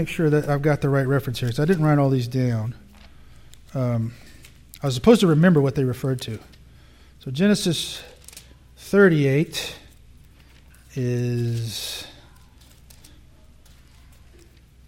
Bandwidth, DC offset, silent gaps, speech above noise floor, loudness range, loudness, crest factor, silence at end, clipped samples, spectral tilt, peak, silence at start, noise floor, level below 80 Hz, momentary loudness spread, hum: 16.5 kHz; under 0.1%; none; 30 dB; 9 LU; -21 LUFS; 22 dB; 2.75 s; under 0.1%; -6.5 dB/octave; -2 dBFS; 0 s; -50 dBFS; -48 dBFS; 20 LU; none